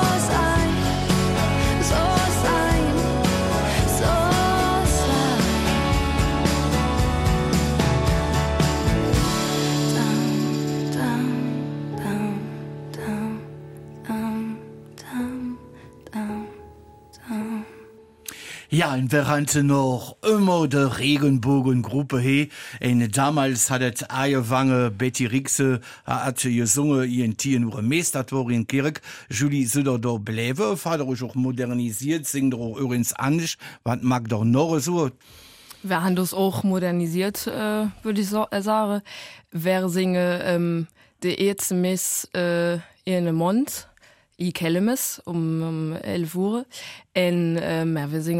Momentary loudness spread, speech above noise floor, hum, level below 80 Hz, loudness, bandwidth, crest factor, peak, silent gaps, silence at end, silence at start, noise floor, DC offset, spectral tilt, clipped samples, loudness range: 10 LU; 33 dB; none; -36 dBFS; -23 LUFS; 16 kHz; 16 dB; -6 dBFS; none; 0 s; 0 s; -56 dBFS; under 0.1%; -5 dB/octave; under 0.1%; 9 LU